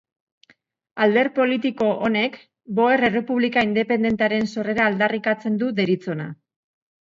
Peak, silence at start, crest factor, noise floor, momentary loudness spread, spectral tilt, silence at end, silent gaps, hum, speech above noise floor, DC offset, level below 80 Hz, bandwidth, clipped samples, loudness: -6 dBFS; 0.95 s; 16 dB; -59 dBFS; 7 LU; -6.5 dB/octave; 0.7 s; none; none; 38 dB; under 0.1%; -60 dBFS; 7.6 kHz; under 0.1%; -21 LUFS